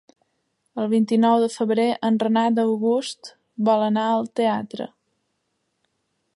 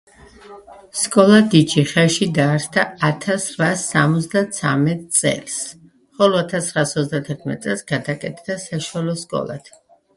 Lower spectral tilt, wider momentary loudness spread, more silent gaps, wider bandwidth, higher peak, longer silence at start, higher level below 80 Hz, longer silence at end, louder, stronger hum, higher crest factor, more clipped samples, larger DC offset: first, -6 dB/octave vs -4.5 dB/octave; first, 15 LU vs 12 LU; neither; about the same, 11.5 kHz vs 11.5 kHz; second, -6 dBFS vs 0 dBFS; first, 0.75 s vs 0.45 s; second, -76 dBFS vs -58 dBFS; first, 1.5 s vs 0.5 s; second, -21 LUFS vs -18 LUFS; neither; about the same, 16 dB vs 18 dB; neither; neither